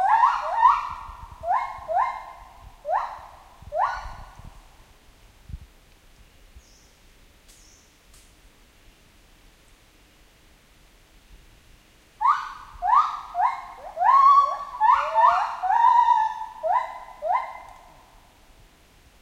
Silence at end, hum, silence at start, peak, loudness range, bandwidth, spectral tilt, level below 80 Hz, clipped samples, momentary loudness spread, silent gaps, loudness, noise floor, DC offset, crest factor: 1.55 s; none; 0 s; -6 dBFS; 13 LU; 14 kHz; -3 dB/octave; -52 dBFS; under 0.1%; 22 LU; none; -22 LUFS; -55 dBFS; under 0.1%; 20 dB